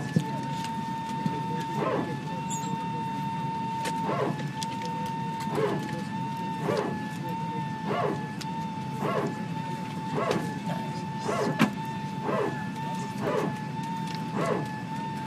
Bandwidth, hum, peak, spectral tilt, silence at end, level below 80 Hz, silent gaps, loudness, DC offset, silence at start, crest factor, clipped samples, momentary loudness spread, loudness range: 14 kHz; none; -8 dBFS; -6 dB/octave; 0 s; -64 dBFS; none; -31 LUFS; under 0.1%; 0 s; 22 dB; under 0.1%; 5 LU; 1 LU